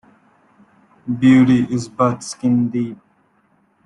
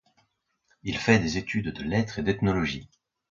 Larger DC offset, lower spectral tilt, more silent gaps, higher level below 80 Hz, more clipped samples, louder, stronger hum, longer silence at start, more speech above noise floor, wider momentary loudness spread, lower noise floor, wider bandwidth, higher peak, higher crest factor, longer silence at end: neither; about the same, -6.5 dB/octave vs -6 dB/octave; neither; second, -56 dBFS vs -48 dBFS; neither; first, -17 LUFS vs -26 LUFS; neither; first, 1.05 s vs 0.85 s; about the same, 44 dB vs 47 dB; first, 15 LU vs 10 LU; second, -60 dBFS vs -73 dBFS; first, 11 kHz vs 7.4 kHz; about the same, -2 dBFS vs -4 dBFS; second, 16 dB vs 24 dB; first, 0.9 s vs 0.45 s